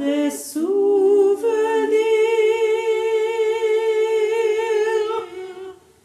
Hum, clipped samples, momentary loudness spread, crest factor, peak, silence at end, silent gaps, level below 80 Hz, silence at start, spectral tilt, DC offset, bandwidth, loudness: none; under 0.1%; 10 LU; 12 dB; -8 dBFS; 0.3 s; none; -72 dBFS; 0 s; -2.5 dB/octave; under 0.1%; 14 kHz; -19 LUFS